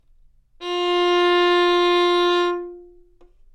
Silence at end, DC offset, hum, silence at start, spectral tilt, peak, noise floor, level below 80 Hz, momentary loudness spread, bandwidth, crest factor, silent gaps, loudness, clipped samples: 0.7 s; under 0.1%; none; 0.6 s; -2.5 dB/octave; -10 dBFS; -53 dBFS; -54 dBFS; 13 LU; 9.4 kHz; 10 dB; none; -18 LUFS; under 0.1%